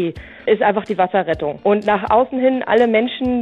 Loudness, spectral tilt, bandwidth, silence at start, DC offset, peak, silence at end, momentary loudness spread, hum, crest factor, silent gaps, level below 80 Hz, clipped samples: -17 LUFS; -7.5 dB/octave; 7.8 kHz; 0 s; under 0.1%; -4 dBFS; 0 s; 5 LU; none; 14 dB; none; -46 dBFS; under 0.1%